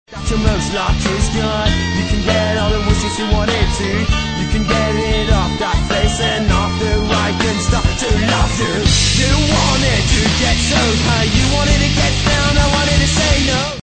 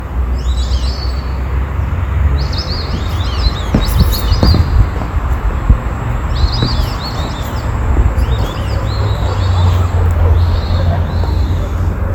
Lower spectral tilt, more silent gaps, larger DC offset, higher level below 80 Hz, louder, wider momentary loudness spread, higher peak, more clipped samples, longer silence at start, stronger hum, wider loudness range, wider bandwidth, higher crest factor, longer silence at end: second, -4 dB/octave vs -6.5 dB/octave; neither; neither; about the same, -20 dBFS vs -16 dBFS; about the same, -15 LUFS vs -15 LUFS; second, 4 LU vs 7 LU; about the same, -2 dBFS vs 0 dBFS; second, under 0.1% vs 0.1%; about the same, 0.1 s vs 0 s; neither; about the same, 3 LU vs 3 LU; second, 9.2 kHz vs 19 kHz; about the same, 14 dB vs 12 dB; about the same, 0.05 s vs 0 s